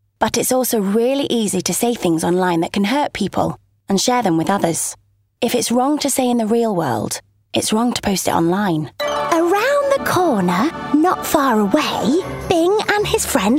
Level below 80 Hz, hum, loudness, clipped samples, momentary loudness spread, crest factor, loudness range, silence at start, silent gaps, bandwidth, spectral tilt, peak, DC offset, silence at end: -46 dBFS; none; -17 LUFS; under 0.1%; 5 LU; 16 dB; 2 LU; 0.2 s; none; 16.5 kHz; -4 dB/octave; -2 dBFS; under 0.1%; 0 s